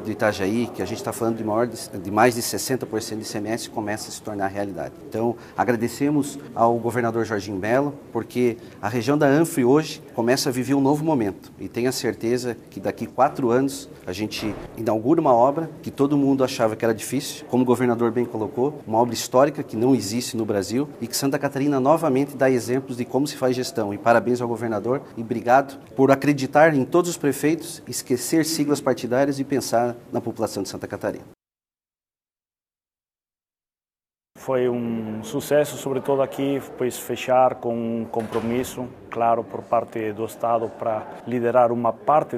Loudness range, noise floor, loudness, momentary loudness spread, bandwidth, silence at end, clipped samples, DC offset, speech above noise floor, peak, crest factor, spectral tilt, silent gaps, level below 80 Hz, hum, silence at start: 6 LU; under -90 dBFS; -23 LUFS; 10 LU; 15.5 kHz; 0 s; under 0.1%; under 0.1%; over 68 dB; 0 dBFS; 22 dB; -5.5 dB/octave; none; -60 dBFS; none; 0 s